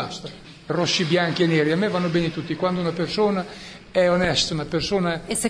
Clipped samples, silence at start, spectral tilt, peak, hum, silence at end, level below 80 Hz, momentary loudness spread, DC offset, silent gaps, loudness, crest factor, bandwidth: under 0.1%; 0 s; -4.5 dB/octave; -6 dBFS; none; 0 s; -48 dBFS; 12 LU; under 0.1%; none; -22 LUFS; 16 dB; 11 kHz